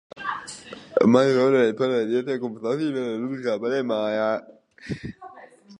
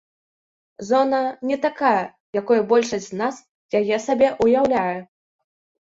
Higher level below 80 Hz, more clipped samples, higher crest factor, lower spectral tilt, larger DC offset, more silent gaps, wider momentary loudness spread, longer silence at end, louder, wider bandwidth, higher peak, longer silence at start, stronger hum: about the same, -60 dBFS vs -60 dBFS; neither; first, 22 dB vs 16 dB; about the same, -6 dB/octave vs -5 dB/octave; neither; second, none vs 2.20-2.33 s, 3.49-3.69 s; first, 19 LU vs 9 LU; second, 0.05 s vs 0.8 s; about the same, -23 LUFS vs -21 LUFS; first, 10.5 kHz vs 8 kHz; about the same, -2 dBFS vs -4 dBFS; second, 0.15 s vs 0.8 s; neither